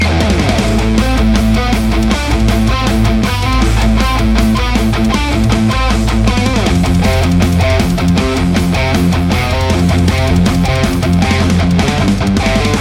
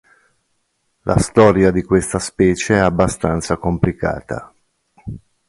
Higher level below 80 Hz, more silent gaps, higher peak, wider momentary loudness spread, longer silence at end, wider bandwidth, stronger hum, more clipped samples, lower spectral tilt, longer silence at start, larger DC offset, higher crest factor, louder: first, -16 dBFS vs -36 dBFS; neither; about the same, 0 dBFS vs 0 dBFS; second, 2 LU vs 17 LU; second, 0 s vs 0.3 s; first, 16.5 kHz vs 11.5 kHz; neither; neither; about the same, -6 dB/octave vs -6 dB/octave; second, 0 s vs 1.05 s; neither; second, 10 dB vs 18 dB; first, -12 LUFS vs -16 LUFS